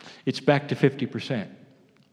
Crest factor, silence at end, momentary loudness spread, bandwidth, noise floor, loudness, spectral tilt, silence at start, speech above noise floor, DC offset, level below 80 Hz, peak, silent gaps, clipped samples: 22 dB; 0.55 s; 9 LU; 11 kHz; -56 dBFS; -26 LUFS; -7 dB/octave; 0.05 s; 31 dB; under 0.1%; -76 dBFS; -6 dBFS; none; under 0.1%